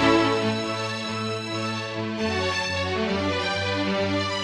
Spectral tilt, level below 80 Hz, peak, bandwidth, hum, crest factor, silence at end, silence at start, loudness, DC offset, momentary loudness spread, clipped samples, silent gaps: -4.5 dB/octave; -54 dBFS; -6 dBFS; 12.5 kHz; none; 18 dB; 0 s; 0 s; -25 LUFS; under 0.1%; 5 LU; under 0.1%; none